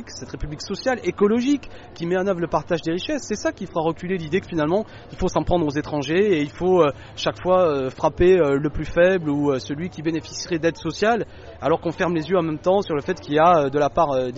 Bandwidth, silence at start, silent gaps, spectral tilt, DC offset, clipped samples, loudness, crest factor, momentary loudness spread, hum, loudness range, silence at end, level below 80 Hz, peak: 8 kHz; 0 s; none; -5 dB/octave; under 0.1%; under 0.1%; -22 LUFS; 16 dB; 9 LU; none; 4 LU; 0 s; -42 dBFS; -4 dBFS